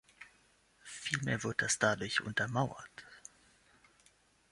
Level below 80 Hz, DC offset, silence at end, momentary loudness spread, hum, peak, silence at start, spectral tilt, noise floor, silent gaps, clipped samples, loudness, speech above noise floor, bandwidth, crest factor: -68 dBFS; under 0.1%; 1.35 s; 25 LU; none; -16 dBFS; 0.2 s; -3.5 dB/octave; -69 dBFS; none; under 0.1%; -34 LUFS; 34 dB; 11.5 kHz; 24 dB